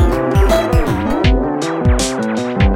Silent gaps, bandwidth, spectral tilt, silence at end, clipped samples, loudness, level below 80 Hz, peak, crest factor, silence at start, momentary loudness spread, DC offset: none; 16.5 kHz; -6 dB/octave; 0 s; under 0.1%; -15 LUFS; -18 dBFS; 0 dBFS; 12 dB; 0 s; 5 LU; under 0.1%